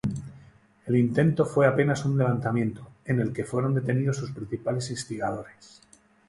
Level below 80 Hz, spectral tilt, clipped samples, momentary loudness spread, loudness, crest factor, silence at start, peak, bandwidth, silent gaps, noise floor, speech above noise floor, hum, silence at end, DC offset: -56 dBFS; -7 dB/octave; under 0.1%; 15 LU; -26 LUFS; 18 dB; 0.05 s; -8 dBFS; 11.5 kHz; none; -55 dBFS; 29 dB; none; 0.8 s; under 0.1%